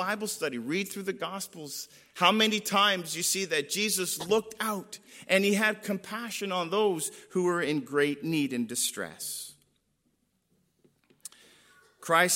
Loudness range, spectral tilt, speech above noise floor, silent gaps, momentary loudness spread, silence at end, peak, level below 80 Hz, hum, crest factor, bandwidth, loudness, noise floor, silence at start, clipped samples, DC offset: 8 LU; -2.5 dB/octave; 45 dB; none; 14 LU; 0 s; -8 dBFS; -78 dBFS; none; 22 dB; 16.5 kHz; -28 LUFS; -74 dBFS; 0 s; under 0.1%; under 0.1%